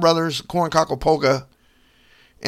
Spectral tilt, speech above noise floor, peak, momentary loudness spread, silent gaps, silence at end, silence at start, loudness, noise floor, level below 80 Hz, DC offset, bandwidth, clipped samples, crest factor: -5 dB/octave; 38 dB; -2 dBFS; 5 LU; none; 0 s; 0 s; -20 LUFS; -57 dBFS; -44 dBFS; under 0.1%; 15.5 kHz; under 0.1%; 18 dB